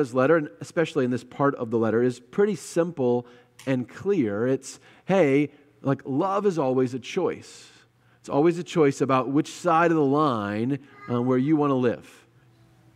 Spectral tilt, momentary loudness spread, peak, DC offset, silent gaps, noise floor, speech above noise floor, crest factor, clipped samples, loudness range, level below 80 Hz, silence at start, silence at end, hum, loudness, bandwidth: -7 dB/octave; 9 LU; -8 dBFS; under 0.1%; none; -58 dBFS; 34 dB; 18 dB; under 0.1%; 3 LU; -72 dBFS; 0 s; 0.95 s; none; -24 LUFS; 13 kHz